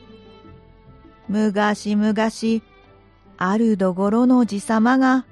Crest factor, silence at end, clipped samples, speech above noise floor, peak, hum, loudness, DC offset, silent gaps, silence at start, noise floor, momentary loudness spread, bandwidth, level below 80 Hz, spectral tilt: 16 dB; 0.1 s; under 0.1%; 32 dB; -6 dBFS; none; -19 LUFS; under 0.1%; none; 0.15 s; -50 dBFS; 8 LU; 11.5 kHz; -56 dBFS; -6 dB/octave